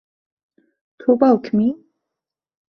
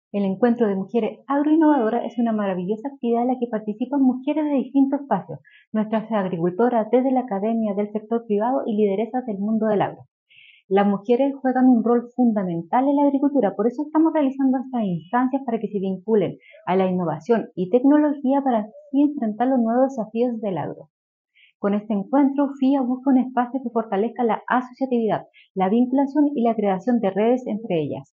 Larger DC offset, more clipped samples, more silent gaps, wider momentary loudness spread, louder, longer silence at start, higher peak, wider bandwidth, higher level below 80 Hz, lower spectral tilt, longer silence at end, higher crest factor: neither; neither; second, none vs 5.67-5.72 s, 10.11-10.26 s, 10.64-10.69 s, 20.90-21.25 s, 21.55-21.60 s, 25.50-25.55 s; about the same, 9 LU vs 7 LU; first, -18 LUFS vs -21 LUFS; first, 1.05 s vs 0.15 s; about the same, -2 dBFS vs -4 dBFS; about the same, 6 kHz vs 6.6 kHz; first, -62 dBFS vs -76 dBFS; first, -9.5 dB/octave vs -7 dB/octave; first, 0.95 s vs 0.1 s; about the same, 20 dB vs 16 dB